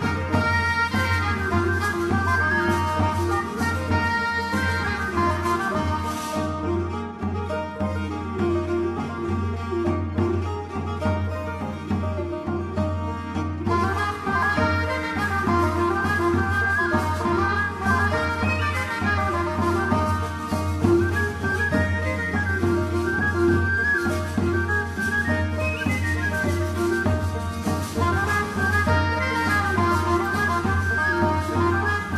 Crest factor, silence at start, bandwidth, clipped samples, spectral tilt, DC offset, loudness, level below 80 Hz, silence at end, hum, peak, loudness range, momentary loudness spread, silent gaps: 18 dB; 0 s; 13.5 kHz; under 0.1%; -6 dB/octave; under 0.1%; -23 LUFS; -40 dBFS; 0 s; none; -6 dBFS; 5 LU; 6 LU; none